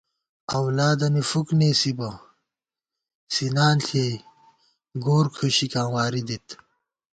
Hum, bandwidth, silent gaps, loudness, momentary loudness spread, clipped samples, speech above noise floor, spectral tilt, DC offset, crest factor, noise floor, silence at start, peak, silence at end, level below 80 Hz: none; 9.2 kHz; 3.15-3.27 s; -23 LUFS; 14 LU; under 0.1%; 66 dB; -5 dB/octave; under 0.1%; 18 dB; -89 dBFS; 0.5 s; -8 dBFS; 0.6 s; -60 dBFS